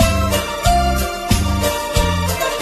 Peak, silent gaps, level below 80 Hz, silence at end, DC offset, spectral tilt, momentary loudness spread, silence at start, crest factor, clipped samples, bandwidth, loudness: 0 dBFS; none; -22 dBFS; 0 s; under 0.1%; -4.5 dB/octave; 3 LU; 0 s; 16 dB; under 0.1%; 14 kHz; -17 LUFS